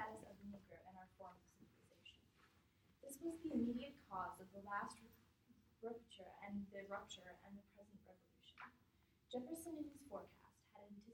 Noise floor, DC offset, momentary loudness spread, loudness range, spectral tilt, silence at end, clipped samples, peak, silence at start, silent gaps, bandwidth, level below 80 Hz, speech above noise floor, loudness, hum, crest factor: -77 dBFS; under 0.1%; 19 LU; 7 LU; -5 dB/octave; 0 s; under 0.1%; -32 dBFS; 0 s; none; 16.5 kHz; -78 dBFS; 27 dB; -52 LUFS; none; 22 dB